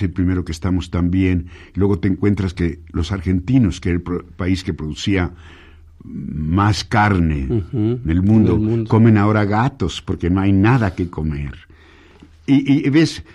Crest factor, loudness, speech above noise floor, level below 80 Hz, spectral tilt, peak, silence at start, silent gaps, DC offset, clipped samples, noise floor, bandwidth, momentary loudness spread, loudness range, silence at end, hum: 16 dB; -18 LUFS; 29 dB; -34 dBFS; -7.5 dB/octave; -2 dBFS; 0 s; none; under 0.1%; under 0.1%; -46 dBFS; 10.5 kHz; 10 LU; 5 LU; 0.1 s; none